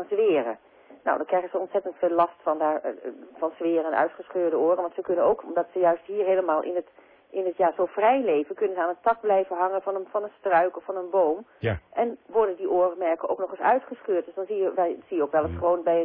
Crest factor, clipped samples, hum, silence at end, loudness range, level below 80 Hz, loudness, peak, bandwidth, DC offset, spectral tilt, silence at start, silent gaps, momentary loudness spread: 16 dB; under 0.1%; none; 0 s; 2 LU; -58 dBFS; -25 LUFS; -10 dBFS; 4.1 kHz; under 0.1%; -10.5 dB/octave; 0 s; none; 8 LU